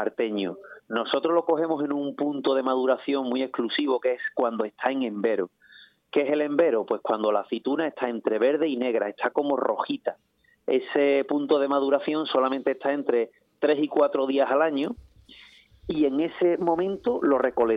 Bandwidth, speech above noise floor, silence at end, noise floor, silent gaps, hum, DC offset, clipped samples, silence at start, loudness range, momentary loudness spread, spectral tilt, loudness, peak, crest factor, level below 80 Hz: 5.2 kHz; 29 dB; 0 s; -54 dBFS; none; none; under 0.1%; under 0.1%; 0 s; 2 LU; 7 LU; -7.5 dB/octave; -25 LUFS; -6 dBFS; 18 dB; -64 dBFS